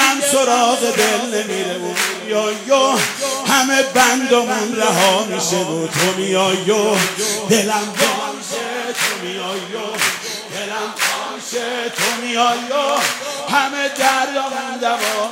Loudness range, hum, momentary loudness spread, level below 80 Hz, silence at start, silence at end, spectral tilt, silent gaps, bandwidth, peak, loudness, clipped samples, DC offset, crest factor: 5 LU; none; 10 LU; -68 dBFS; 0 s; 0 s; -2 dB/octave; none; 16 kHz; -2 dBFS; -17 LUFS; under 0.1%; under 0.1%; 16 dB